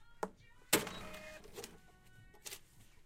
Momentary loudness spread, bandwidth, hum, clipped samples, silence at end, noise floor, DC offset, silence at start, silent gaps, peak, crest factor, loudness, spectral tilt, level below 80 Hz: 18 LU; 16.5 kHz; none; under 0.1%; 0 s; -61 dBFS; under 0.1%; 0 s; none; -14 dBFS; 30 dB; -41 LUFS; -2 dB/octave; -64 dBFS